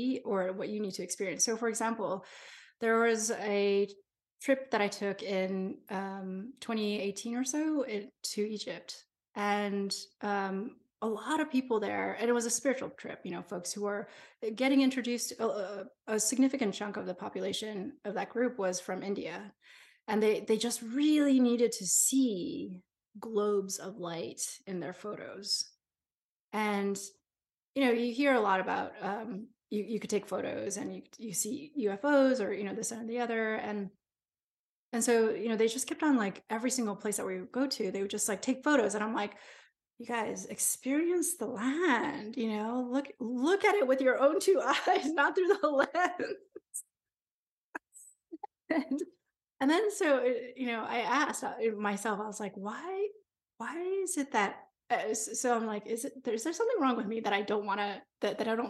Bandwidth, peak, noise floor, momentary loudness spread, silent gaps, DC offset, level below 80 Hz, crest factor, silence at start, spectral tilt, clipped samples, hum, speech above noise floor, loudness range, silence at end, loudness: 12.5 kHz; -12 dBFS; under -90 dBFS; 13 LU; 4.32-4.37 s, 26.16-26.48 s, 27.58-27.74 s, 34.44-34.92 s, 47.31-47.73 s; under 0.1%; -82 dBFS; 20 dB; 0 s; -3.5 dB/octave; under 0.1%; none; over 58 dB; 7 LU; 0 s; -32 LUFS